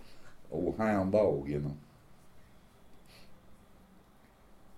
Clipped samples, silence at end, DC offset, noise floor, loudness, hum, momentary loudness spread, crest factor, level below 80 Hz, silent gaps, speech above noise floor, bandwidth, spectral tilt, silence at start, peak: under 0.1%; 0 s; under 0.1%; -60 dBFS; -32 LUFS; none; 13 LU; 20 dB; -58 dBFS; none; 30 dB; 15.5 kHz; -8.5 dB/octave; 0 s; -16 dBFS